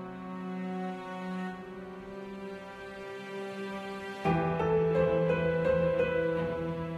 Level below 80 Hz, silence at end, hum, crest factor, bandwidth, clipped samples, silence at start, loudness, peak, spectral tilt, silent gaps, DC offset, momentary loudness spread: -54 dBFS; 0 s; none; 16 dB; 11 kHz; under 0.1%; 0 s; -32 LUFS; -16 dBFS; -8 dB/octave; none; under 0.1%; 15 LU